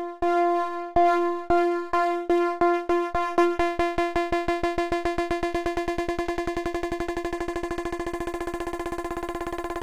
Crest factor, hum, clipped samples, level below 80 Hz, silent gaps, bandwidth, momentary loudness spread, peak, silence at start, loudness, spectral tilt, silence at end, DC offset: 16 dB; none; under 0.1%; -42 dBFS; none; 14 kHz; 9 LU; -10 dBFS; 0 s; -26 LUFS; -5.5 dB/octave; 0 s; under 0.1%